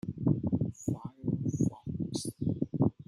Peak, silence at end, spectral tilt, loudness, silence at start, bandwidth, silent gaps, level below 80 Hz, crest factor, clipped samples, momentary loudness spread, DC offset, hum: -12 dBFS; 0.05 s; -8 dB/octave; -33 LUFS; 0.05 s; 13 kHz; none; -56 dBFS; 20 dB; under 0.1%; 6 LU; under 0.1%; none